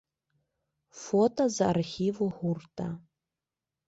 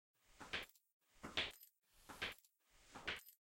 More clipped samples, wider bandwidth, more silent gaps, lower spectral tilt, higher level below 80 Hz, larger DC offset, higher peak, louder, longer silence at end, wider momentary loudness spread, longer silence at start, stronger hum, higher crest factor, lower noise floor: neither; second, 8 kHz vs 16.5 kHz; second, none vs 0.92-1.00 s; first, -6 dB/octave vs -2 dB/octave; first, -64 dBFS vs -72 dBFS; neither; first, -14 dBFS vs -26 dBFS; first, -29 LUFS vs -48 LUFS; first, 0.9 s vs 0.15 s; second, 12 LU vs 18 LU; first, 0.95 s vs 0.3 s; neither; second, 18 dB vs 26 dB; first, -90 dBFS vs -73 dBFS